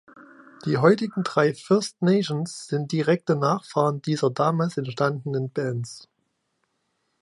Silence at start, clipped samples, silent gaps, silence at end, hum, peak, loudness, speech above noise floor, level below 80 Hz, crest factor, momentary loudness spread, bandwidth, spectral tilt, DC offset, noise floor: 0.2 s; under 0.1%; none; 1.2 s; none; -2 dBFS; -24 LUFS; 51 dB; -70 dBFS; 22 dB; 9 LU; 11.5 kHz; -6.5 dB/octave; under 0.1%; -74 dBFS